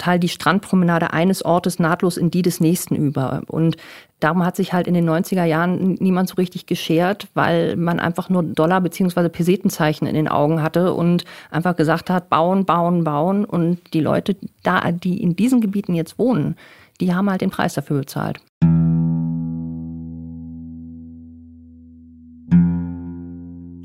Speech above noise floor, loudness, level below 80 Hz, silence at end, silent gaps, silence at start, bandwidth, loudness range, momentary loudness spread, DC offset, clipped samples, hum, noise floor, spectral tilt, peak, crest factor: 25 dB; -19 LUFS; -52 dBFS; 0 s; 18.49-18.61 s; 0 s; 15.5 kHz; 6 LU; 12 LU; under 0.1%; under 0.1%; none; -43 dBFS; -7 dB/octave; -2 dBFS; 16 dB